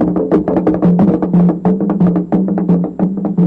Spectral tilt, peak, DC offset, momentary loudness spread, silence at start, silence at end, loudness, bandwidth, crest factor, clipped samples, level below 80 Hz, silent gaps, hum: -12 dB/octave; -4 dBFS; under 0.1%; 4 LU; 0 s; 0 s; -13 LUFS; 3 kHz; 8 dB; under 0.1%; -40 dBFS; none; none